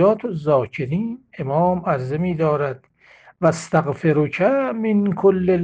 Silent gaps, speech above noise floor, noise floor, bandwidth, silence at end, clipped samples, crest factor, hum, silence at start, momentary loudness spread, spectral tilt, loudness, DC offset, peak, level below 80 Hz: none; 31 dB; -50 dBFS; 9.4 kHz; 0 s; under 0.1%; 16 dB; none; 0 s; 7 LU; -8 dB/octave; -20 LUFS; under 0.1%; -4 dBFS; -54 dBFS